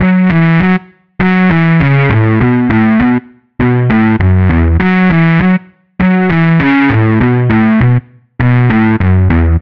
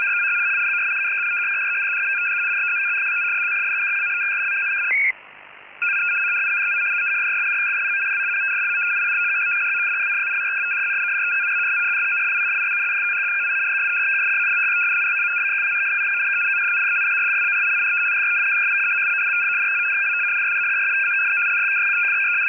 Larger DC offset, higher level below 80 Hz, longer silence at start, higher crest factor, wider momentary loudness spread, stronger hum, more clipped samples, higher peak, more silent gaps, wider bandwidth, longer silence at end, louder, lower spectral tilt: first, 1% vs under 0.1%; first, -24 dBFS vs -74 dBFS; about the same, 0 s vs 0 s; about the same, 8 dB vs 8 dB; about the same, 4 LU vs 2 LU; neither; neither; first, 0 dBFS vs -12 dBFS; neither; first, 5.4 kHz vs 3.5 kHz; about the same, 0 s vs 0 s; first, -10 LUFS vs -18 LUFS; first, -10 dB/octave vs 3.5 dB/octave